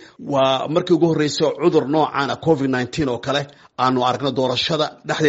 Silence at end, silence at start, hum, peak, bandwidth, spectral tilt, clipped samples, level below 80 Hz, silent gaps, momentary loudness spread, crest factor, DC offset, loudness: 0 s; 0 s; none; -4 dBFS; 8 kHz; -4 dB/octave; under 0.1%; -54 dBFS; none; 6 LU; 16 dB; under 0.1%; -19 LUFS